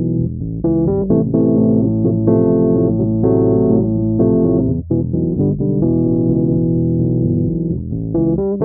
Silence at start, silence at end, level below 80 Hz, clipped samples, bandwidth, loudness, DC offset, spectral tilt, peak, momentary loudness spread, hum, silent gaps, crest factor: 0 s; 0 s; -34 dBFS; under 0.1%; 1.8 kHz; -15 LUFS; 0.1%; -13.5 dB/octave; -2 dBFS; 5 LU; none; none; 12 dB